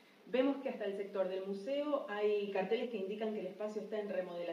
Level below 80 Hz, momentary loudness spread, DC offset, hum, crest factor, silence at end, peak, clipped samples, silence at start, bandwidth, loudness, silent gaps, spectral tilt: under -90 dBFS; 6 LU; under 0.1%; none; 18 dB; 0 s; -20 dBFS; under 0.1%; 0.25 s; 11 kHz; -38 LUFS; none; -6.5 dB/octave